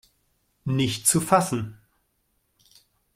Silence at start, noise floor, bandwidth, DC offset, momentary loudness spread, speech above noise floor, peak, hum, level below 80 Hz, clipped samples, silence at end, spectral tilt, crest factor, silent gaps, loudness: 0.65 s; -71 dBFS; 16 kHz; under 0.1%; 15 LU; 49 dB; -4 dBFS; none; -58 dBFS; under 0.1%; 1.4 s; -4 dB/octave; 24 dB; none; -23 LUFS